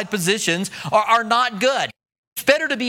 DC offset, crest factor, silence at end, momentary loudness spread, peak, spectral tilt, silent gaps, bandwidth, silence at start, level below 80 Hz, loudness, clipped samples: under 0.1%; 20 dB; 0 s; 7 LU; 0 dBFS; -3 dB/octave; 2.18-2.36 s; 17.5 kHz; 0 s; -66 dBFS; -19 LUFS; under 0.1%